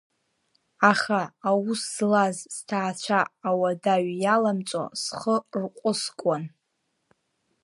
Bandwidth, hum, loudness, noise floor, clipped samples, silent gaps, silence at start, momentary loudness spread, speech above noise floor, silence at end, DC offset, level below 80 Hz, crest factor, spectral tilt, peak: 11.5 kHz; none; -25 LUFS; -76 dBFS; under 0.1%; none; 0.8 s; 8 LU; 51 dB; 1.15 s; under 0.1%; -76 dBFS; 22 dB; -4.5 dB/octave; -4 dBFS